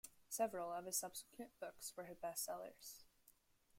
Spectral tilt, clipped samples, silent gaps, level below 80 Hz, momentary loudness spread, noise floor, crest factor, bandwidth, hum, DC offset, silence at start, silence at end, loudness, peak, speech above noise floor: -2 dB/octave; under 0.1%; none; -82 dBFS; 14 LU; -74 dBFS; 22 dB; 16.5 kHz; none; under 0.1%; 0.05 s; 0 s; -47 LUFS; -28 dBFS; 26 dB